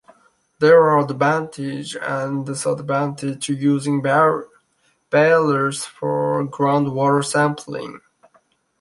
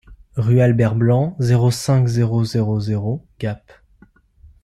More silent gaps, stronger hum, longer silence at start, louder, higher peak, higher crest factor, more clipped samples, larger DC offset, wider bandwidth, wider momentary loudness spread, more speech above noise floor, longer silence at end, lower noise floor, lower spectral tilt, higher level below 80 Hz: neither; neither; first, 0.6 s vs 0.1 s; about the same, -19 LUFS vs -18 LUFS; about the same, -2 dBFS vs -4 dBFS; about the same, 18 dB vs 14 dB; neither; neither; second, 11.5 kHz vs 13 kHz; about the same, 13 LU vs 12 LU; first, 46 dB vs 35 dB; second, 0.85 s vs 1.05 s; first, -64 dBFS vs -52 dBFS; second, -5.5 dB/octave vs -7.5 dB/octave; second, -64 dBFS vs -48 dBFS